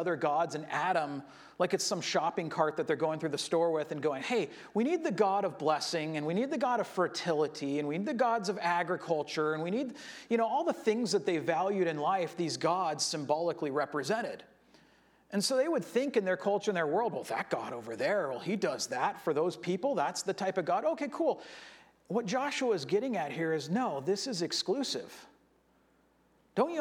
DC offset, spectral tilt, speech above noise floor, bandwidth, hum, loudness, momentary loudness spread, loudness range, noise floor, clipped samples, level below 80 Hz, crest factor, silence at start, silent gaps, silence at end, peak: under 0.1%; -4.5 dB/octave; 36 dB; 17 kHz; none; -32 LUFS; 5 LU; 2 LU; -68 dBFS; under 0.1%; -80 dBFS; 18 dB; 0 s; none; 0 s; -14 dBFS